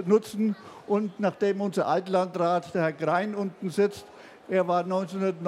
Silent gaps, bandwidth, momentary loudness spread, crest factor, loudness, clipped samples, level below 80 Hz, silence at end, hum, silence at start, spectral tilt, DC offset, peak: none; 13.5 kHz; 5 LU; 16 dB; -27 LUFS; under 0.1%; -74 dBFS; 0 s; none; 0 s; -7 dB/octave; under 0.1%; -10 dBFS